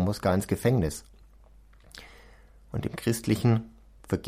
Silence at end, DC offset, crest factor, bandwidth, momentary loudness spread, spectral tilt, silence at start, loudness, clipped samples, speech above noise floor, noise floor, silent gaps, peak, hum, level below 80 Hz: 0 s; under 0.1%; 16 dB; 16 kHz; 22 LU; -6.5 dB/octave; 0 s; -28 LUFS; under 0.1%; 28 dB; -54 dBFS; none; -12 dBFS; none; -48 dBFS